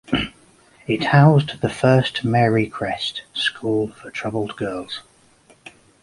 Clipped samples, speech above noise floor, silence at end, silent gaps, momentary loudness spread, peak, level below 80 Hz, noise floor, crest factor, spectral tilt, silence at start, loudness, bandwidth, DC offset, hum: under 0.1%; 35 dB; 1 s; none; 15 LU; -2 dBFS; -50 dBFS; -54 dBFS; 20 dB; -6.5 dB/octave; 0.1 s; -20 LUFS; 11.5 kHz; under 0.1%; none